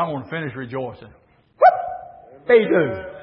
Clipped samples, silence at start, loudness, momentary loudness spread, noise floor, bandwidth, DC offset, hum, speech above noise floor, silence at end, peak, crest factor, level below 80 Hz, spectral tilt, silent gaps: under 0.1%; 0 s; -19 LUFS; 17 LU; -40 dBFS; 5.6 kHz; under 0.1%; none; 19 dB; 0 s; -2 dBFS; 18 dB; -58 dBFS; -11 dB/octave; none